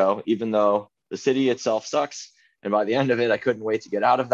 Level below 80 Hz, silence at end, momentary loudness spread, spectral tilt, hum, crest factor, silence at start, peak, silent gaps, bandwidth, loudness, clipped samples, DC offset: -70 dBFS; 0 s; 10 LU; -5 dB/octave; none; 16 dB; 0 s; -6 dBFS; none; 8 kHz; -23 LUFS; under 0.1%; under 0.1%